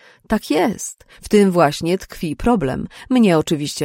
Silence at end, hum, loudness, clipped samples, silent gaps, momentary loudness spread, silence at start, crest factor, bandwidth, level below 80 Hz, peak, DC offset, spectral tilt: 0 s; none; -18 LUFS; under 0.1%; none; 13 LU; 0.3 s; 16 dB; 16.5 kHz; -40 dBFS; -2 dBFS; under 0.1%; -5.5 dB/octave